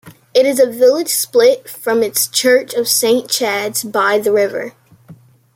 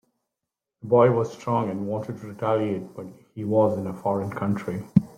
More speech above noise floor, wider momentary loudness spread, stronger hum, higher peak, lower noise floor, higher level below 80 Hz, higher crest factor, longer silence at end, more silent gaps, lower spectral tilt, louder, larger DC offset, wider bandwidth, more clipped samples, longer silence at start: second, 28 dB vs 62 dB; second, 7 LU vs 16 LU; neither; about the same, 0 dBFS vs -2 dBFS; second, -42 dBFS vs -86 dBFS; about the same, -64 dBFS vs -60 dBFS; second, 14 dB vs 22 dB; first, 0.4 s vs 0.05 s; neither; second, -1.5 dB/octave vs -9 dB/octave; first, -14 LUFS vs -25 LUFS; neither; first, 16.5 kHz vs 14.5 kHz; neither; second, 0.05 s vs 0.85 s